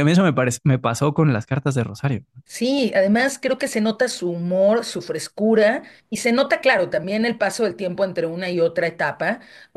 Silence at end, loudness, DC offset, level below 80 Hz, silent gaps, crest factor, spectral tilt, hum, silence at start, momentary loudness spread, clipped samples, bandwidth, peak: 0.4 s; -20 LUFS; under 0.1%; -60 dBFS; none; 16 dB; -5.5 dB/octave; none; 0 s; 8 LU; under 0.1%; 12.5 kHz; -4 dBFS